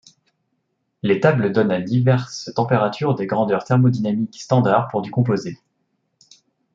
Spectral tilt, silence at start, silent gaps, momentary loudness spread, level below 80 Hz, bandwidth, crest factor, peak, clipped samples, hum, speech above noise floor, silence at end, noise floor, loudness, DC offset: -7.5 dB/octave; 1.05 s; none; 7 LU; -62 dBFS; 7.6 kHz; 18 dB; -2 dBFS; under 0.1%; none; 53 dB; 1.2 s; -72 dBFS; -19 LUFS; under 0.1%